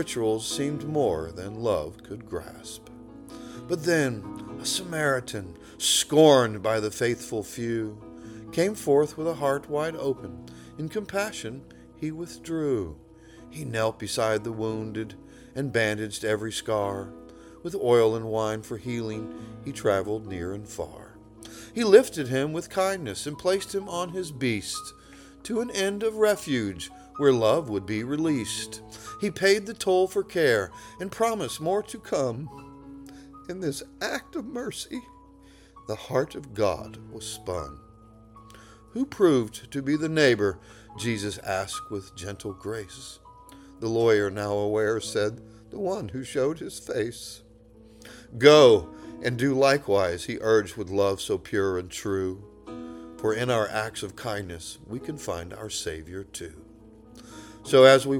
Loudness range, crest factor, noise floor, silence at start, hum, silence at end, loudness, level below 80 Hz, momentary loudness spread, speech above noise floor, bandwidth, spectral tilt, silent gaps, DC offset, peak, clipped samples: 10 LU; 26 dB; -52 dBFS; 0 s; none; 0 s; -26 LUFS; -56 dBFS; 20 LU; 27 dB; 18.5 kHz; -4.5 dB/octave; none; under 0.1%; -2 dBFS; under 0.1%